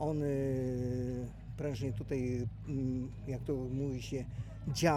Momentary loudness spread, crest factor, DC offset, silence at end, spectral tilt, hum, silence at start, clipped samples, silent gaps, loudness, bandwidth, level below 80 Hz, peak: 7 LU; 20 dB; under 0.1%; 0 s; -6.5 dB/octave; none; 0 s; under 0.1%; none; -38 LUFS; 15.5 kHz; -50 dBFS; -16 dBFS